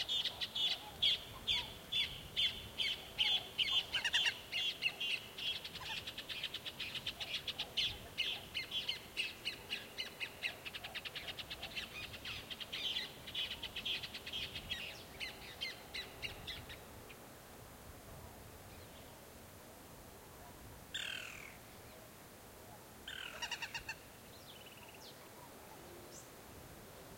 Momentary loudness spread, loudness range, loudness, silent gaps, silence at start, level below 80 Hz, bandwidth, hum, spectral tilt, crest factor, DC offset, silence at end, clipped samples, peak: 20 LU; 15 LU; -39 LUFS; none; 0 s; -66 dBFS; 16.5 kHz; none; -1.5 dB/octave; 22 dB; under 0.1%; 0 s; under 0.1%; -20 dBFS